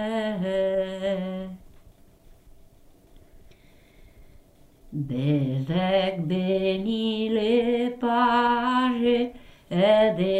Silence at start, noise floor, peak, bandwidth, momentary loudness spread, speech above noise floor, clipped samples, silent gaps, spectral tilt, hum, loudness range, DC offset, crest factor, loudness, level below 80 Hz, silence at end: 0 s; -53 dBFS; -8 dBFS; 10 kHz; 10 LU; 30 dB; under 0.1%; none; -7.5 dB/octave; none; 14 LU; under 0.1%; 16 dB; -24 LUFS; -54 dBFS; 0 s